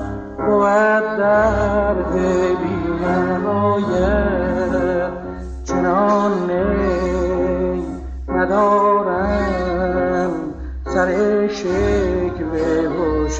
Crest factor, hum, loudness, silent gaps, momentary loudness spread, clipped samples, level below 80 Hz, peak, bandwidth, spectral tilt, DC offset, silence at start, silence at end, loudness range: 14 dB; none; -18 LUFS; none; 8 LU; under 0.1%; -30 dBFS; -4 dBFS; 8 kHz; -7 dB/octave; under 0.1%; 0 s; 0 s; 2 LU